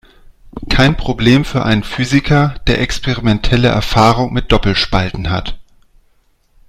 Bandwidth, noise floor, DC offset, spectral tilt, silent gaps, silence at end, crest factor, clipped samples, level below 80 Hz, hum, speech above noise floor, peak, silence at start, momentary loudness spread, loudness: 14.5 kHz; -54 dBFS; under 0.1%; -6 dB/octave; none; 1.05 s; 14 dB; 0.1%; -24 dBFS; none; 42 dB; 0 dBFS; 0.45 s; 8 LU; -14 LUFS